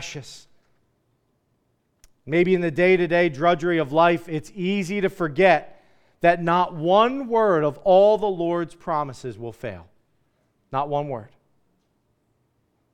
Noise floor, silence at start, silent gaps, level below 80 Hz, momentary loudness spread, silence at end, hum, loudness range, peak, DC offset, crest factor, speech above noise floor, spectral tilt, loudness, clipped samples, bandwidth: -69 dBFS; 0 s; none; -58 dBFS; 16 LU; 1.65 s; none; 11 LU; -4 dBFS; under 0.1%; 20 dB; 48 dB; -6.5 dB/octave; -21 LUFS; under 0.1%; 11 kHz